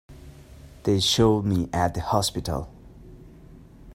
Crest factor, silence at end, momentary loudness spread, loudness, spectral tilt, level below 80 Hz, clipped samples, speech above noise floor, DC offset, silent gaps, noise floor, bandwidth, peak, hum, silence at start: 20 dB; 0 s; 12 LU; -24 LUFS; -5 dB/octave; -44 dBFS; under 0.1%; 24 dB; under 0.1%; none; -47 dBFS; 16 kHz; -6 dBFS; none; 0.1 s